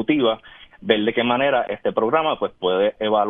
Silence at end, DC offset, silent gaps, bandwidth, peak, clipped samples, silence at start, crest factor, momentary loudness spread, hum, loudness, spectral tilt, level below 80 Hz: 0 s; under 0.1%; none; 3.9 kHz; -2 dBFS; under 0.1%; 0 s; 18 dB; 5 LU; none; -20 LUFS; -8.5 dB/octave; -58 dBFS